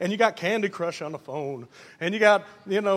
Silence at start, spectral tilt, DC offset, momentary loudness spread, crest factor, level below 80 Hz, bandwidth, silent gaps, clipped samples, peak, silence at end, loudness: 0 s; -5 dB/octave; under 0.1%; 14 LU; 22 dB; -78 dBFS; 14 kHz; none; under 0.1%; -4 dBFS; 0 s; -25 LUFS